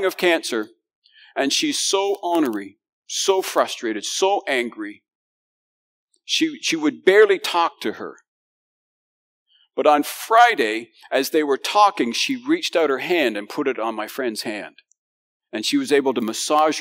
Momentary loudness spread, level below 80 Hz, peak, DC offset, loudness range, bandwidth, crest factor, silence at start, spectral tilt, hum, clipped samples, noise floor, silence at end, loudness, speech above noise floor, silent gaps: 13 LU; -88 dBFS; -2 dBFS; under 0.1%; 5 LU; 16 kHz; 20 dB; 0 s; -2 dB/octave; none; under 0.1%; under -90 dBFS; 0 s; -20 LUFS; over 70 dB; 0.95-1.02 s, 2.89-3.02 s, 5.15-6.08 s, 8.28-9.46 s, 14.98-15.40 s